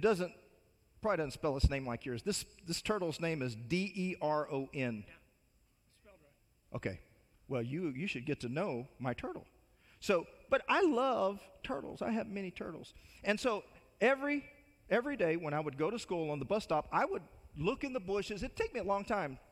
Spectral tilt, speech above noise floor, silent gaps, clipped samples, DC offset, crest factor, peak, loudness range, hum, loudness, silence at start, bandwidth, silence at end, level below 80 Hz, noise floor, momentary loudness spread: -5.5 dB/octave; 36 dB; none; under 0.1%; under 0.1%; 22 dB; -14 dBFS; 6 LU; none; -36 LUFS; 0 s; 15.5 kHz; 0.15 s; -52 dBFS; -72 dBFS; 11 LU